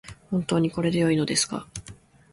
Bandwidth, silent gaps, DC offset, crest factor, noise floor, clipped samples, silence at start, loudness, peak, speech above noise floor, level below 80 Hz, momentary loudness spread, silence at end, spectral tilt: 11.5 kHz; none; under 0.1%; 16 dB; -48 dBFS; under 0.1%; 0.05 s; -25 LUFS; -10 dBFS; 24 dB; -54 dBFS; 14 LU; 0.4 s; -4.5 dB/octave